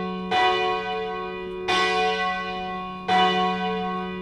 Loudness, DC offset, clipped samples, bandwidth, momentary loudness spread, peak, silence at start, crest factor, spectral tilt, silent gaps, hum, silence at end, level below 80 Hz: -24 LUFS; under 0.1%; under 0.1%; 11 kHz; 10 LU; -8 dBFS; 0 s; 16 dB; -4.5 dB/octave; none; none; 0 s; -52 dBFS